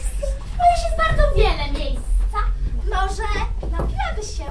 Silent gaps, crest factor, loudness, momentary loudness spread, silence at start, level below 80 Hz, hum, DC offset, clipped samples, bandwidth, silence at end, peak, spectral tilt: none; 18 dB; -22 LUFS; 9 LU; 0 s; -22 dBFS; none; 1%; under 0.1%; 11 kHz; 0 s; -2 dBFS; -5 dB/octave